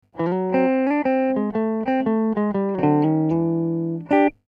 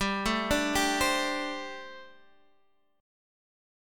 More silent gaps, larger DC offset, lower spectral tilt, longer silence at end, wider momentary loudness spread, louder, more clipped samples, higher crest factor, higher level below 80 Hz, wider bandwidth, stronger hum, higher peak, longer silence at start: neither; neither; first, -10 dB/octave vs -3 dB/octave; second, 0.15 s vs 1 s; second, 4 LU vs 18 LU; first, -21 LUFS vs -28 LUFS; neither; second, 14 dB vs 20 dB; second, -58 dBFS vs -48 dBFS; second, 5.2 kHz vs 17.5 kHz; neither; first, -6 dBFS vs -12 dBFS; first, 0.15 s vs 0 s